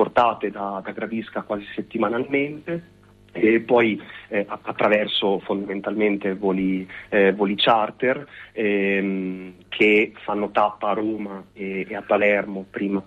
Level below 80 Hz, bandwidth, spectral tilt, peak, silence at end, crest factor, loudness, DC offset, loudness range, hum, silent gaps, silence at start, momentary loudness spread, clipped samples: -60 dBFS; 7.6 kHz; -7.5 dB/octave; -6 dBFS; 0.05 s; 16 dB; -22 LUFS; under 0.1%; 2 LU; none; none; 0 s; 12 LU; under 0.1%